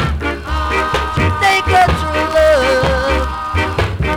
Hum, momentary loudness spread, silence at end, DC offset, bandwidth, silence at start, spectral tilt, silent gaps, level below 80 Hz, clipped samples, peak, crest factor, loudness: none; 7 LU; 0 s; under 0.1%; 17.5 kHz; 0 s; -5 dB/octave; none; -24 dBFS; under 0.1%; 0 dBFS; 14 dB; -14 LUFS